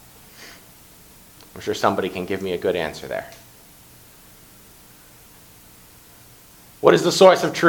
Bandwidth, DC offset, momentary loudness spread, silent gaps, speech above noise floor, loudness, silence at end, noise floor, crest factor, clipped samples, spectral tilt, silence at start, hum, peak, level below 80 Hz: 19 kHz; under 0.1%; 28 LU; none; 30 dB; -19 LUFS; 0 s; -48 dBFS; 22 dB; under 0.1%; -4.5 dB/octave; 0.4 s; 60 Hz at -60 dBFS; 0 dBFS; -56 dBFS